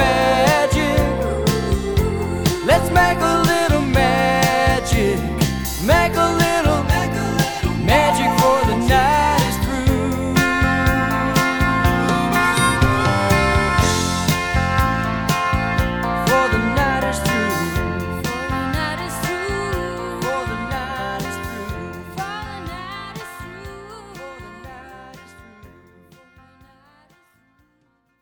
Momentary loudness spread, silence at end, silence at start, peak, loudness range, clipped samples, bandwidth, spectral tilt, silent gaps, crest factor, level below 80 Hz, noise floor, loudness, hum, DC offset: 15 LU; 2.55 s; 0 s; -2 dBFS; 14 LU; under 0.1%; over 20 kHz; -5 dB/octave; none; 16 dB; -30 dBFS; -63 dBFS; -18 LUFS; none; under 0.1%